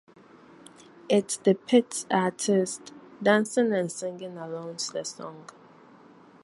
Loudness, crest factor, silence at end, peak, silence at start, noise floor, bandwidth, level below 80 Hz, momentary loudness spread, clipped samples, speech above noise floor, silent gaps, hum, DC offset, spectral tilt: -26 LUFS; 22 dB; 1 s; -6 dBFS; 1.05 s; -53 dBFS; 11.5 kHz; -76 dBFS; 16 LU; under 0.1%; 27 dB; none; none; under 0.1%; -4.5 dB/octave